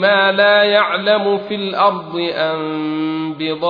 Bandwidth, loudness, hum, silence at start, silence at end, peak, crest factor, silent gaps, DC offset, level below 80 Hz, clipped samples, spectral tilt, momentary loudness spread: 5.2 kHz; -16 LUFS; none; 0 s; 0 s; -2 dBFS; 14 dB; none; under 0.1%; -62 dBFS; under 0.1%; -7 dB/octave; 10 LU